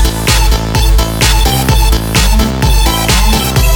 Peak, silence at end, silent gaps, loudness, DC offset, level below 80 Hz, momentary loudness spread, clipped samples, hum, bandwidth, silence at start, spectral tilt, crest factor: 0 dBFS; 0 s; none; -10 LUFS; under 0.1%; -10 dBFS; 2 LU; under 0.1%; none; over 20 kHz; 0 s; -4 dB/octave; 8 dB